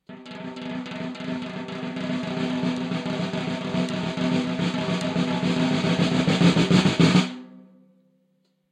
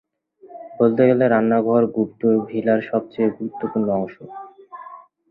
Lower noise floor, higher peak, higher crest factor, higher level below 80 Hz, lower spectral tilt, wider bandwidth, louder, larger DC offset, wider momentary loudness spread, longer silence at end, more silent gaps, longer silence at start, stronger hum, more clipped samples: first, -68 dBFS vs -48 dBFS; about the same, -4 dBFS vs -2 dBFS; about the same, 20 dB vs 18 dB; first, -56 dBFS vs -62 dBFS; second, -6 dB/octave vs -11.5 dB/octave; first, 10 kHz vs 4.1 kHz; second, -24 LUFS vs -19 LUFS; neither; second, 14 LU vs 23 LU; first, 1.1 s vs 0.35 s; neither; second, 0.1 s vs 0.45 s; neither; neither